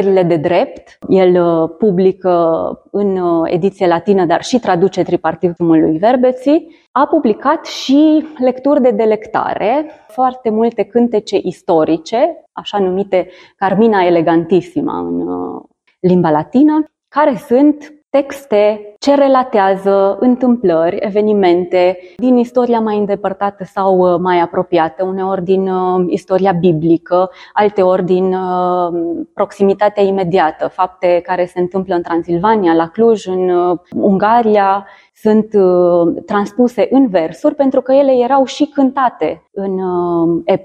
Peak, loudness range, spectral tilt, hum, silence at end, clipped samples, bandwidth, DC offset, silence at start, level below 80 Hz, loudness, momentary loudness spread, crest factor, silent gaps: 0 dBFS; 2 LU; -7 dB/octave; none; 0 s; under 0.1%; 9 kHz; under 0.1%; 0 s; -54 dBFS; -13 LUFS; 7 LU; 12 dB; 6.87-6.94 s